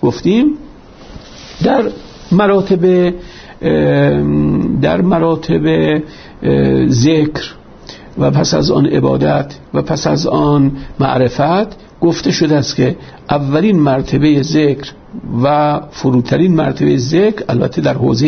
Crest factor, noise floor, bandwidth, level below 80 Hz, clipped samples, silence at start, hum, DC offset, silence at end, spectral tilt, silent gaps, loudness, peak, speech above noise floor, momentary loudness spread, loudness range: 12 dB; -35 dBFS; 6.6 kHz; -36 dBFS; under 0.1%; 0 s; none; under 0.1%; 0 s; -6.5 dB/octave; none; -13 LUFS; 0 dBFS; 23 dB; 10 LU; 1 LU